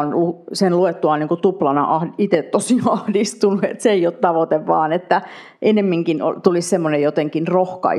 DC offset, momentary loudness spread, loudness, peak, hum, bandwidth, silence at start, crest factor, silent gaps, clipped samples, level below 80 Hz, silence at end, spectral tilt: under 0.1%; 3 LU; -18 LUFS; 0 dBFS; none; 13 kHz; 0 s; 18 dB; none; under 0.1%; -74 dBFS; 0 s; -6 dB/octave